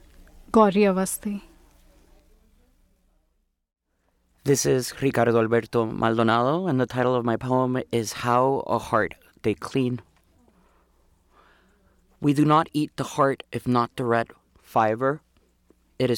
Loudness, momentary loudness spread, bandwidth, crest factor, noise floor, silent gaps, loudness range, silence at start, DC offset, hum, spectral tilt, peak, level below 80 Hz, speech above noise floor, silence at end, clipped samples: -23 LUFS; 9 LU; 18 kHz; 22 dB; -71 dBFS; none; 8 LU; 0.5 s; under 0.1%; none; -5.5 dB/octave; -4 dBFS; -56 dBFS; 49 dB; 0 s; under 0.1%